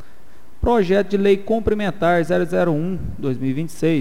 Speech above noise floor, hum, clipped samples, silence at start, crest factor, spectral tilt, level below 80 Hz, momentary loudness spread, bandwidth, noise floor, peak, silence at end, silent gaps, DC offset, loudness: 32 dB; none; under 0.1%; 0.6 s; 14 dB; -7.5 dB/octave; -36 dBFS; 8 LU; 16 kHz; -51 dBFS; -6 dBFS; 0 s; none; 4%; -20 LUFS